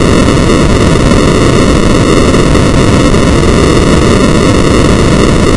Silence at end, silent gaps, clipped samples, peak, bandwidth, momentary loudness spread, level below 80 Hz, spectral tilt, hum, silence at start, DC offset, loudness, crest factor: 0 s; none; 0.6%; 0 dBFS; 11.5 kHz; 1 LU; -14 dBFS; -5.5 dB/octave; none; 0 s; under 0.1%; -7 LUFS; 6 dB